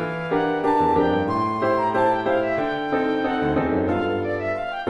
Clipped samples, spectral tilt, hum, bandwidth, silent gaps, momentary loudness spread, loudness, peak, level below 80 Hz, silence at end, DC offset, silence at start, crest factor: under 0.1%; -7.5 dB/octave; none; 11 kHz; none; 5 LU; -22 LUFS; -8 dBFS; -48 dBFS; 0 s; under 0.1%; 0 s; 14 dB